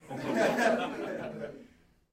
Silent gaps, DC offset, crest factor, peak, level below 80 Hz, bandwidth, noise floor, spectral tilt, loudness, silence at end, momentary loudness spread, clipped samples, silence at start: none; under 0.1%; 18 dB; -14 dBFS; -68 dBFS; 16 kHz; -60 dBFS; -4.5 dB/octave; -31 LUFS; 0.5 s; 15 LU; under 0.1%; 0.05 s